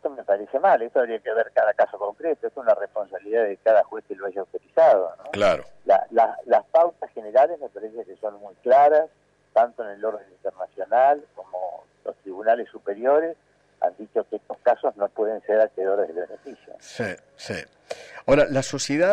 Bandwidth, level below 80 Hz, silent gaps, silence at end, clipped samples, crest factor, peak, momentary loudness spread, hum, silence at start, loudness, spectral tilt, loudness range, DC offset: 10 kHz; -58 dBFS; none; 0 s; under 0.1%; 14 dB; -8 dBFS; 16 LU; 50 Hz at -70 dBFS; 0.05 s; -23 LUFS; -5 dB/octave; 5 LU; under 0.1%